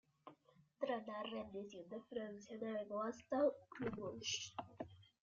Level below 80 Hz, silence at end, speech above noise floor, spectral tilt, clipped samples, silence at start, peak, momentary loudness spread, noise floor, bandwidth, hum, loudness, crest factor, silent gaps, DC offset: -80 dBFS; 0.2 s; 27 dB; -3 dB/octave; under 0.1%; 0.25 s; -26 dBFS; 15 LU; -72 dBFS; 7.4 kHz; none; -45 LUFS; 20 dB; none; under 0.1%